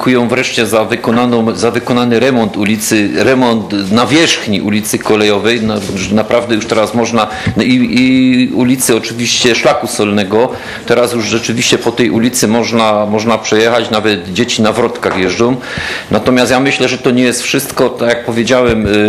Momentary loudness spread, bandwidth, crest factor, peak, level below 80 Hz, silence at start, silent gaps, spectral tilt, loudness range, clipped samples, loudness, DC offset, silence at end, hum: 4 LU; 15.5 kHz; 10 dB; 0 dBFS; -40 dBFS; 0 s; none; -4 dB/octave; 1 LU; 0.3%; -11 LUFS; under 0.1%; 0 s; none